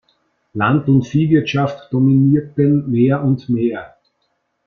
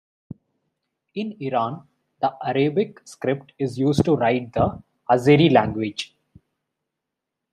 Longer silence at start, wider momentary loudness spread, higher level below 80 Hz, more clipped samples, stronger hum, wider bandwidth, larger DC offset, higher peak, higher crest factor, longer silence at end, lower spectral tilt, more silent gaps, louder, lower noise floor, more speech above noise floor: second, 0.55 s vs 1.15 s; second, 6 LU vs 15 LU; about the same, -52 dBFS vs -54 dBFS; neither; neither; second, 6.6 kHz vs 13 kHz; neither; about the same, -2 dBFS vs -2 dBFS; second, 14 dB vs 20 dB; second, 0.8 s vs 1.45 s; first, -9 dB/octave vs -7 dB/octave; neither; first, -16 LUFS vs -22 LUFS; second, -68 dBFS vs -83 dBFS; second, 53 dB vs 62 dB